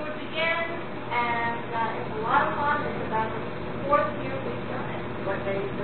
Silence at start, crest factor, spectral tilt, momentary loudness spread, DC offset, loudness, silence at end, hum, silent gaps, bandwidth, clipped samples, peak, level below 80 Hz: 0 s; 20 dB; -10 dB/octave; 8 LU; 1%; -28 LUFS; 0 s; none; none; 4.5 kHz; under 0.1%; -8 dBFS; -52 dBFS